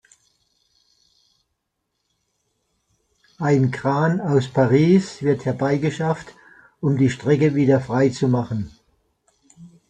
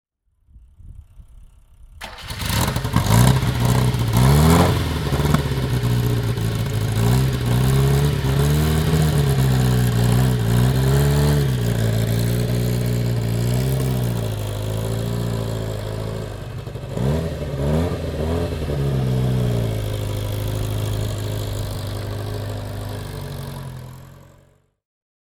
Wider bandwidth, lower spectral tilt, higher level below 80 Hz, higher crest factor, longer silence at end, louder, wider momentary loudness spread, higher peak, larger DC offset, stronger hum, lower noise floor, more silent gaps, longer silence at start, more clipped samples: second, 9.2 kHz vs 19 kHz; first, -7.5 dB/octave vs -6 dB/octave; second, -56 dBFS vs -30 dBFS; about the same, 18 dB vs 20 dB; second, 0.25 s vs 1.1 s; about the same, -20 LUFS vs -20 LUFS; second, 9 LU vs 12 LU; second, -4 dBFS vs 0 dBFS; neither; neither; first, -76 dBFS vs -58 dBFS; neither; first, 3.4 s vs 0.55 s; neither